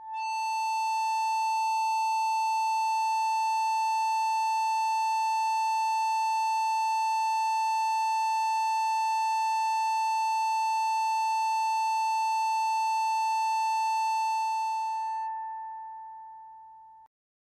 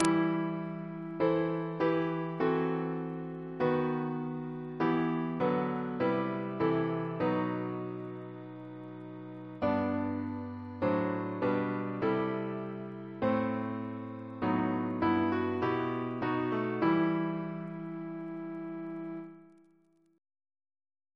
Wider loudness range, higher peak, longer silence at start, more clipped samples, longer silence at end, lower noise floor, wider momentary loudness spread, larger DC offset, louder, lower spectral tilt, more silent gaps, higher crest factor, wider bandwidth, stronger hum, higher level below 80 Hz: second, 2 LU vs 5 LU; second, -22 dBFS vs -8 dBFS; about the same, 0 s vs 0 s; neither; second, 0.5 s vs 1.7 s; second, -51 dBFS vs -68 dBFS; second, 4 LU vs 12 LU; neither; first, -28 LUFS vs -33 LUFS; second, 5 dB/octave vs -7.5 dB/octave; neither; second, 6 dB vs 26 dB; first, 15 kHz vs 11 kHz; first, 60 Hz at -85 dBFS vs none; second, -86 dBFS vs -68 dBFS